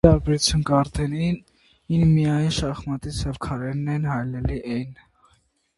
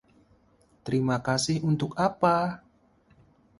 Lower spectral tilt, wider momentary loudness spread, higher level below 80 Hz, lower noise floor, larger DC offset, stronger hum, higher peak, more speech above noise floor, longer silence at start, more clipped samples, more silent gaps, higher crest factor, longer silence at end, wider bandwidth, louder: about the same, -6 dB/octave vs -5.5 dB/octave; about the same, 11 LU vs 9 LU; first, -36 dBFS vs -60 dBFS; about the same, -64 dBFS vs -63 dBFS; neither; neither; first, 0 dBFS vs -8 dBFS; first, 42 dB vs 37 dB; second, 0.05 s vs 0.85 s; neither; neither; about the same, 22 dB vs 20 dB; second, 0.85 s vs 1 s; about the same, 11.5 kHz vs 11.5 kHz; first, -23 LUFS vs -26 LUFS